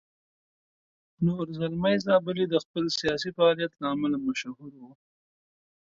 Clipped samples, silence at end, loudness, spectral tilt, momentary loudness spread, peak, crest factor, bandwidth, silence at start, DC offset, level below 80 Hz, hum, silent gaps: under 0.1%; 1.05 s; -27 LUFS; -6 dB/octave; 8 LU; -10 dBFS; 18 dB; 7.8 kHz; 1.2 s; under 0.1%; -64 dBFS; none; 2.65-2.74 s